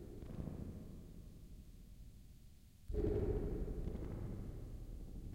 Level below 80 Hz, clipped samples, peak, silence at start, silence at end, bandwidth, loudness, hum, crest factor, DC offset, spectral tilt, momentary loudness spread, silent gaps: -48 dBFS; under 0.1%; -26 dBFS; 0 s; 0 s; 16 kHz; -46 LUFS; none; 18 dB; under 0.1%; -9 dB/octave; 20 LU; none